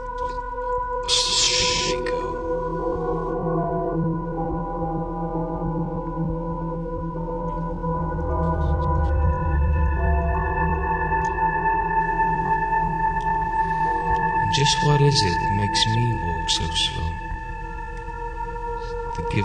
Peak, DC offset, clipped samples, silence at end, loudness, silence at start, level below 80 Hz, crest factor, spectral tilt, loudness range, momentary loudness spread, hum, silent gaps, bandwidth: -6 dBFS; under 0.1%; under 0.1%; 0 s; -23 LUFS; 0 s; -30 dBFS; 16 dB; -4 dB/octave; 7 LU; 11 LU; none; none; 10 kHz